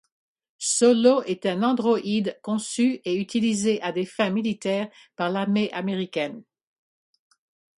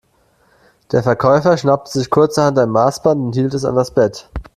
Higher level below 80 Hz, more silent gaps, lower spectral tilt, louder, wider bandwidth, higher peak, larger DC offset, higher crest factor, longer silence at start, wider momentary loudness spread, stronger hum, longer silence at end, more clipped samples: second, -70 dBFS vs -42 dBFS; neither; second, -4.5 dB/octave vs -6.5 dB/octave; second, -24 LUFS vs -15 LUFS; second, 11.5 kHz vs 13.5 kHz; second, -6 dBFS vs 0 dBFS; neither; about the same, 20 dB vs 16 dB; second, 0.6 s vs 0.9 s; first, 10 LU vs 5 LU; neither; first, 1.35 s vs 0.15 s; neither